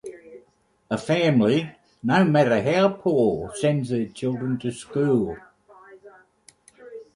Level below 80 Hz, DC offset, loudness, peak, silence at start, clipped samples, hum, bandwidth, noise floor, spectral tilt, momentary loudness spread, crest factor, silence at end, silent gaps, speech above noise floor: -58 dBFS; under 0.1%; -22 LUFS; -6 dBFS; 0.05 s; under 0.1%; none; 11.5 kHz; -61 dBFS; -6.5 dB/octave; 12 LU; 18 dB; 0.15 s; none; 39 dB